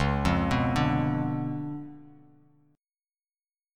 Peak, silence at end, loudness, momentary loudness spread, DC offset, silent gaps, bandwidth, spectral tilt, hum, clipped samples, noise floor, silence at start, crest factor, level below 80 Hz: -10 dBFS; 1.65 s; -28 LUFS; 13 LU; under 0.1%; none; 12.5 kHz; -7 dB/octave; none; under 0.1%; under -90 dBFS; 0 s; 18 dB; -42 dBFS